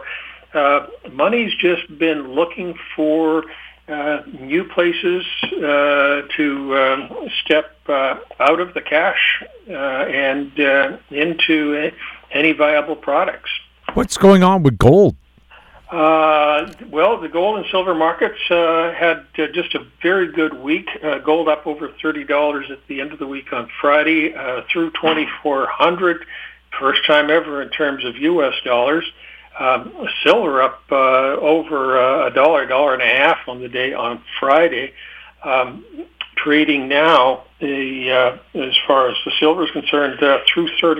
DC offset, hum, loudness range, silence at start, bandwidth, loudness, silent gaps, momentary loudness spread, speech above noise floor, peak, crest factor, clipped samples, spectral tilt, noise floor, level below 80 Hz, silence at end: under 0.1%; none; 5 LU; 0 s; 15.5 kHz; -17 LUFS; none; 12 LU; 30 dB; 0 dBFS; 16 dB; under 0.1%; -5.5 dB/octave; -47 dBFS; -46 dBFS; 0 s